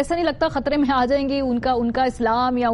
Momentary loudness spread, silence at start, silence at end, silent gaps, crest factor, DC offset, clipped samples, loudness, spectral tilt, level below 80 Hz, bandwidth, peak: 3 LU; 0 s; 0 s; none; 12 dB; under 0.1%; under 0.1%; -21 LUFS; -6 dB/octave; -40 dBFS; 11.5 kHz; -8 dBFS